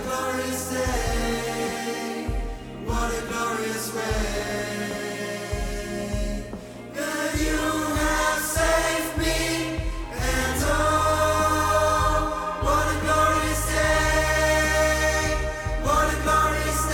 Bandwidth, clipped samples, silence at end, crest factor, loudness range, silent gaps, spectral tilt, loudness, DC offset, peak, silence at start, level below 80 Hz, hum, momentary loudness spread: 19 kHz; under 0.1%; 0 s; 16 dB; 7 LU; none; -4 dB/octave; -24 LUFS; under 0.1%; -8 dBFS; 0 s; -32 dBFS; none; 9 LU